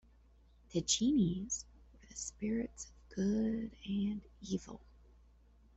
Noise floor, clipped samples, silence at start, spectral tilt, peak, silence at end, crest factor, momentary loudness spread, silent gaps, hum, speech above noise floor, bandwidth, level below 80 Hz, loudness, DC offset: -64 dBFS; under 0.1%; 0.7 s; -4.5 dB/octave; -18 dBFS; 1 s; 20 dB; 18 LU; none; none; 28 dB; 8.2 kHz; -58 dBFS; -37 LUFS; under 0.1%